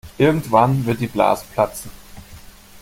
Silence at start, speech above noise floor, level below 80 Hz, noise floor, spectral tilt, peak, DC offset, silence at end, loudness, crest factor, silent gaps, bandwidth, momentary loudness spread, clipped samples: 0.05 s; 24 dB; -46 dBFS; -41 dBFS; -6.5 dB/octave; -2 dBFS; under 0.1%; 0.45 s; -18 LUFS; 18 dB; none; 17 kHz; 9 LU; under 0.1%